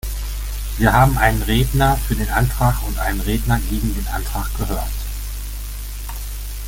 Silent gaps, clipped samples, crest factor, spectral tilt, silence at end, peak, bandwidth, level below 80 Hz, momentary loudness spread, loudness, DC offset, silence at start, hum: none; under 0.1%; 18 dB; -5 dB/octave; 0 s; -2 dBFS; 17 kHz; -24 dBFS; 15 LU; -20 LUFS; under 0.1%; 0.05 s; 50 Hz at -25 dBFS